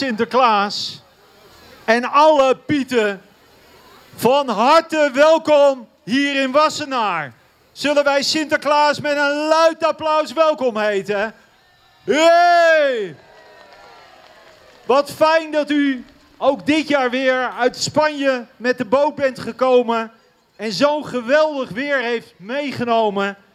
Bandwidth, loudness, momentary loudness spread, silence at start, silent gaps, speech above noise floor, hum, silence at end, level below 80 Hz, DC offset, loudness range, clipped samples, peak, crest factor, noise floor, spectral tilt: 15 kHz; -17 LUFS; 11 LU; 0 s; none; 36 dB; none; 0.2 s; -62 dBFS; under 0.1%; 3 LU; under 0.1%; -2 dBFS; 14 dB; -53 dBFS; -3.5 dB/octave